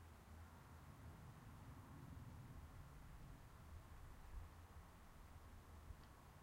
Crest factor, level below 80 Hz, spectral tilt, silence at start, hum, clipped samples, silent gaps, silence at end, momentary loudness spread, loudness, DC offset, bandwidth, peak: 16 dB; -64 dBFS; -6 dB/octave; 0 s; none; under 0.1%; none; 0 s; 4 LU; -62 LUFS; under 0.1%; 16 kHz; -44 dBFS